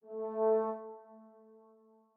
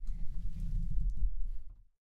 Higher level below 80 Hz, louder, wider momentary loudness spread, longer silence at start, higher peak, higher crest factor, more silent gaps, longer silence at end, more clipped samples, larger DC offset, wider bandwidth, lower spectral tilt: second, under -90 dBFS vs -36 dBFS; first, -34 LUFS vs -42 LUFS; first, 20 LU vs 11 LU; about the same, 0.05 s vs 0 s; about the same, -22 dBFS vs -20 dBFS; about the same, 16 dB vs 12 dB; neither; first, 0.9 s vs 0.35 s; neither; neither; first, 2.6 kHz vs 0.6 kHz; about the same, -8 dB/octave vs -8.5 dB/octave